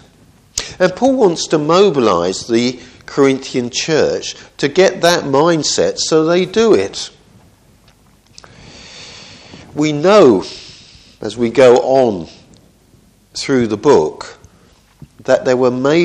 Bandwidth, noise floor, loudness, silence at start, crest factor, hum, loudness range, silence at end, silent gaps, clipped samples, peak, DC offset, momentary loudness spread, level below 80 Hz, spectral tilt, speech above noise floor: 13 kHz; -49 dBFS; -13 LUFS; 0.55 s; 14 dB; none; 5 LU; 0 s; none; under 0.1%; 0 dBFS; under 0.1%; 18 LU; -50 dBFS; -4.5 dB/octave; 37 dB